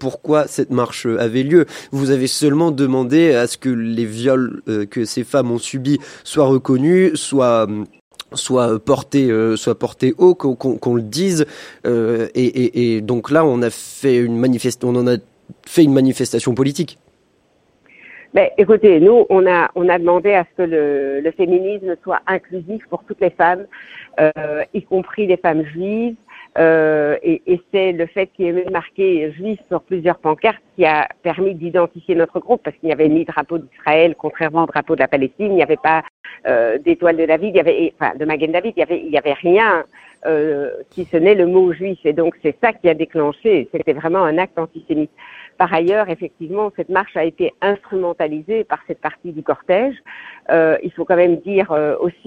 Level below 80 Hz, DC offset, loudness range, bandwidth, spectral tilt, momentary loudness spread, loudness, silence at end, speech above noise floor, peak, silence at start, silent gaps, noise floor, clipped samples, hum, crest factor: -58 dBFS; under 0.1%; 5 LU; 15 kHz; -6 dB/octave; 9 LU; -17 LUFS; 0.15 s; 42 dB; 0 dBFS; 0 s; 8.01-8.11 s, 36.10-36.24 s; -58 dBFS; under 0.1%; none; 16 dB